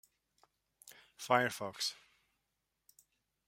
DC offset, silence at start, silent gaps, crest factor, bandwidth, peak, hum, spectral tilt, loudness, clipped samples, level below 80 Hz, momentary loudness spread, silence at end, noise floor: under 0.1%; 1.2 s; none; 28 dB; 16.5 kHz; -14 dBFS; none; -3 dB/octave; -35 LUFS; under 0.1%; -84 dBFS; 25 LU; 1.55 s; -85 dBFS